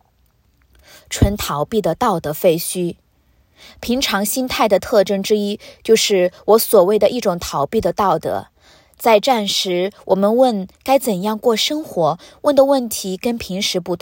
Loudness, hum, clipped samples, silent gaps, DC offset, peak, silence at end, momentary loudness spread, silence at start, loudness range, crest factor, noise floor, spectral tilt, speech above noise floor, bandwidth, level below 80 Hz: -17 LUFS; none; under 0.1%; none; under 0.1%; 0 dBFS; 0.05 s; 9 LU; 1.1 s; 4 LU; 18 dB; -58 dBFS; -4 dB/octave; 42 dB; 17 kHz; -38 dBFS